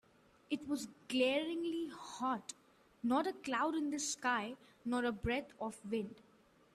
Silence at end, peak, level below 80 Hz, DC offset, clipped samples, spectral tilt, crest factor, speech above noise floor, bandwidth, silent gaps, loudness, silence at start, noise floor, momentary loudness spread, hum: 0.55 s; -22 dBFS; -64 dBFS; under 0.1%; under 0.1%; -3.5 dB/octave; 18 dB; 30 dB; 13.5 kHz; none; -39 LUFS; 0.5 s; -68 dBFS; 11 LU; none